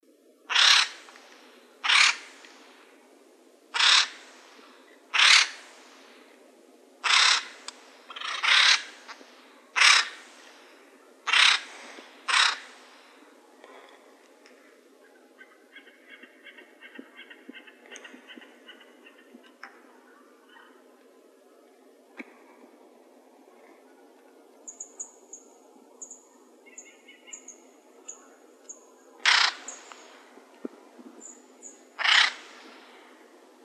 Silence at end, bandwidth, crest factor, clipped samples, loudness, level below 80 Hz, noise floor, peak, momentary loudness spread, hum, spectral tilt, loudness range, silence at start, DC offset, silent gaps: 1.25 s; 14 kHz; 26 dB; under 0.1%; -21 LUFS; under -90 dBFS; -57 dBFS; -4 dBFS; 29 LU; none; 4.5 dB/octave; 23 LU; 0.5 s; under 0.1%; none